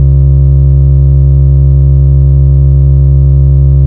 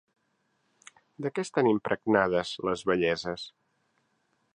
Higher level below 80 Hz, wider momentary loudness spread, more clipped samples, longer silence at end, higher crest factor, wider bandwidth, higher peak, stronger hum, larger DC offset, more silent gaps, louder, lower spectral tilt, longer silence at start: first, -8 dBFS vs -64 dBFS; second, 0 LU vs 12 LU; neither; second, 0 s vs 1.05 s; second, 4 dB vs 22 dB; second, 1.3 kHz vs 10.5 kHz; first, 0 dBFS vs -8 dBFS; neither; neither; neither; first, -7 LUFS vs -28 LUFS; first, -14 dB/octave vs -5.5 dB/octave; second, 0 s vs 1.2 s